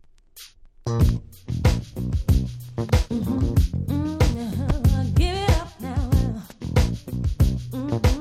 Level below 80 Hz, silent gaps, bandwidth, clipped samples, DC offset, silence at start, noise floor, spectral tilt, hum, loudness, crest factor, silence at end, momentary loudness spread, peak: -26 dBFS; none; 15 kHz; under 0.1%; under 0.1%; 0.35 s; -47 dBFS; -7 dB/octave; none; -24 LUFS; 16 dB; 0 s; 10 LU; -6 dBFS